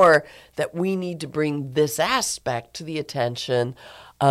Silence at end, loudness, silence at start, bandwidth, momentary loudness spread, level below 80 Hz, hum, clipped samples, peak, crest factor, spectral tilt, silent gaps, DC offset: 0 s; -24 LUFS; 0 s; 15.5 kHz; 10 LU; -58 dBFS; none; under 0.1%; -6 dBFS; 16 dB; -4.5 dB/octave; none; under 0.1%